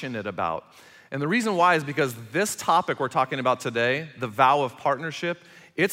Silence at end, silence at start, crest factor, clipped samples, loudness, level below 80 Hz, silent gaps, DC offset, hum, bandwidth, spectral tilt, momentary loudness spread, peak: 0 s; 0 s; 20 dB; under 0.1%; -24 LUFS; -70 dBFS; none; under 0.1%; none; 16 kHz; -4.5 dB/octave; 11 LU; -6 dBFS